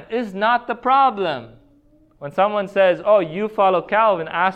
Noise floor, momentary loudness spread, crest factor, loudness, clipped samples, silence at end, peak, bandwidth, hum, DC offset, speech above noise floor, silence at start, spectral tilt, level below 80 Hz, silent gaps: -54 dBFS; 9 LU; 16 dB; -18 LUFS; under 0.1%; 0 s; -4 dBFS; 8.4 kHz; none; under 0.1%; 36 dB; 0 s; -6.5 dB/octave; -58 dBFS; none